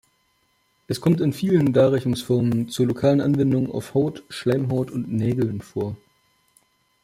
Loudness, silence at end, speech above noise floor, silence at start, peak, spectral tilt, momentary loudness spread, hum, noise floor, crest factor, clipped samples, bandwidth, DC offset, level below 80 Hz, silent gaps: -22 LUFS; 1.05 s; 45 dB; 0.9 s; -6 dBFS; -7.5 dB/octave; 10 LU; none; -66 dBFS; 16 dB; under 0.1%; 15.5 kHz; under 0.1%; -56 dBFS; none